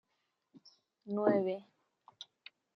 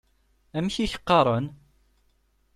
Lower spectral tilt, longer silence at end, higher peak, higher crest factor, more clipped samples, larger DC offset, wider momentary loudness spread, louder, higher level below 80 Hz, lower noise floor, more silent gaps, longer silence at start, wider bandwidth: first, -7.5 dB/octave vs -6 dB/octave; second, 0.55 s vs 1 s; second, -16 dBFS vs -6 dBFS; about the same, 22 dB vs 22 dB; neither; neither; first, 25 LU vs 14 LU; second, -34 LUFS vs -25 LUFS; second, under -90 dBFS vs -50 dBFS; first, -82 dBFS vs -66 dBFS; neither; about the same, 0.55 s vs 0.55 s; second, 6.4 kHz vs 14 kHz